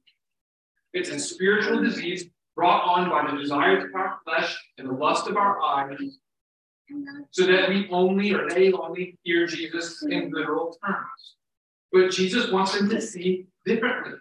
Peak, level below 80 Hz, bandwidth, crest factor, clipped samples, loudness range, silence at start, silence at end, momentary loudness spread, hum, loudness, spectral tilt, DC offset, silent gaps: -8 dBFS; -74 dBFS; 10.5 kHz; 18 dB; under 0.1%; 3 LU; 0.95 s; 0 s; 12 LU; none; -24 LUFS; -4.5 dB/octave; under 0.1%; 6.41-6.85 s, 11.57-11.89 s